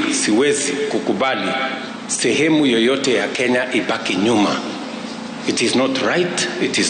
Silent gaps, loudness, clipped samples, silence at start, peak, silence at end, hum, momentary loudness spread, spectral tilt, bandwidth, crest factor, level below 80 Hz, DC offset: none; -18 LUFS; under 0.1%; 0 s; -6 dBFS; 0 s; none; 9 LU; -3 dB/octave; 9.6 kHz; 12 dB; -60 dBFS; under 0.1%